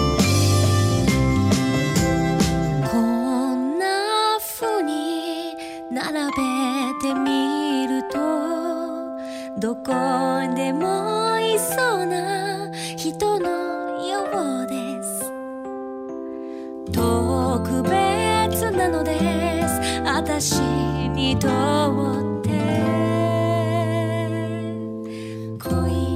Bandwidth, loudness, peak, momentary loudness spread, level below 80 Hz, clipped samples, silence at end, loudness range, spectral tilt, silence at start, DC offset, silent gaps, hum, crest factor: 16 kHz; -22 LUFS; -6 dBFS; 11 LU; -40 dBFS; under 0.1%; 0 s; 5 LU; -5 dB/octave; 0 s; under 0.1%; none; none; 16 dB